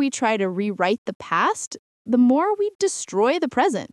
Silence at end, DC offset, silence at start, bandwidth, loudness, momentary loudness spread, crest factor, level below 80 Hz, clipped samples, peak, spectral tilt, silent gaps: 0.05 s; under 0.1%; 0 s; 12 kHz; -21 LUFS; 8 LU; 16 dB; -68 dBFS; under 0.1%; -6 dBFS; -4 dB/octave; 0.98-1.05 s, 1.15-1.20 s, 1.67-1.71 s, 1.79-2.05 s, 2.75-2.79 s